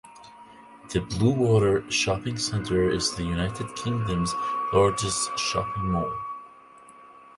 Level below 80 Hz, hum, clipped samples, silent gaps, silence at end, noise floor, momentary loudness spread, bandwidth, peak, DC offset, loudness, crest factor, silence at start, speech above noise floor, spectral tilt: -44 dBFS; none; under 0.1%; none; 0.15 s; -50 dBFS; 9 LU; 11.5 kHz; -8 dBFS; under 0.1%; -25 LUFS; 18 dB; 0.05 s; 25 dB; -4.5 dB/octave